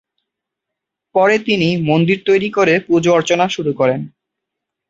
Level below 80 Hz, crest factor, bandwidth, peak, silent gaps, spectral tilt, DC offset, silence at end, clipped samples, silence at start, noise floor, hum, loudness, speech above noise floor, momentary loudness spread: -56 dBFS; 16 dB; 8 kHz; 0 dBFS; none; -5.5 dB/octave; under 0.1%; 0.8 s; under 0.1%; 1.15 s; -81 dBFS; none; -15 LUFS; 67 dB; 4 LU